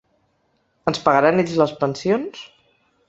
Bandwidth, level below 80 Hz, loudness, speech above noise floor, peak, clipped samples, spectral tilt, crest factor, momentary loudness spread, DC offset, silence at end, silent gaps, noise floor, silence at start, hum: 8.2 kHz; -60 dBFS; -19 LUFS; 47 dB; -2 dBFS; under 0.1%; -6 dB/octave; 20 dB; 12 LU; under 0.1%; 0.6 s; none; -66 dBFS; 0.85 s; none